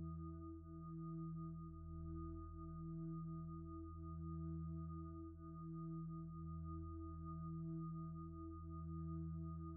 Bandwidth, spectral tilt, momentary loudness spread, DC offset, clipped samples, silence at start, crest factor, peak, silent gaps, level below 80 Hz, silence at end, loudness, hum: 1.6 kHz; -8 dB/octave; 5 LU; under 0.1%; under 0.1%; 0 s; 10 dB; -40 dBFS; none; -60 dBFS; 0 s; -51 LUFS; none